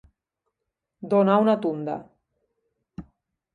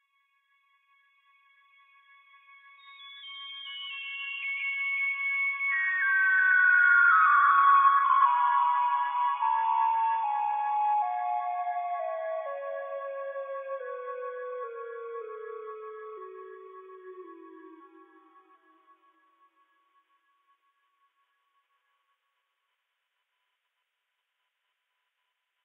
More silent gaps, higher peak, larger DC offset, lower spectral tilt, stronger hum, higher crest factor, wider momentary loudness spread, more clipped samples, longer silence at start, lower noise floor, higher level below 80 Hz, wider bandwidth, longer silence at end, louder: neither; first, -6 dBFS vs -12 dBFS; neither; first, -9 dB/octave vs 15.5 dB/octave; neither; about the same, 22 dB vs 18 dB; about the same, 25 LU vs 23 LU; neither; second, 1 s vs 2.85 s; about the same, -83 dBFS vs -82 dBFS; first, -62 dBFS vs under -90 dBFS; first, 4.8 kHz vs 3.9 kHz; second, 0.5 s vs 7.8 s; first, -22 LUFS vs -26 LUFS